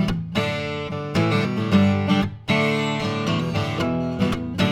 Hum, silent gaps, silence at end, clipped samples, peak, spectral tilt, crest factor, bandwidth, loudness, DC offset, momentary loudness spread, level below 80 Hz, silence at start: none; none; 0 s; under 0.1%; -6 dBFS; -6.5 dB/octave; 16 dB; 14 kHz; -22 LUFS; under 0.1%; 6 LU; -44 dBFS; 0 s